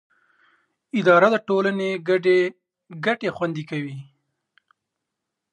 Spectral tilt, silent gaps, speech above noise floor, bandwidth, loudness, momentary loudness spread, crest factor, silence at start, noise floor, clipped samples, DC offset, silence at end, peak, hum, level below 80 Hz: -6.5 dB/octave; none; 62 dB; 9.4 kHz; -21 LUFS; 14 LU; 20 dB; 0.95 s; -82 dBFS; under 0.1%; under 0.1%; 1.5 s; -4 dBFS; none; -74 dBFS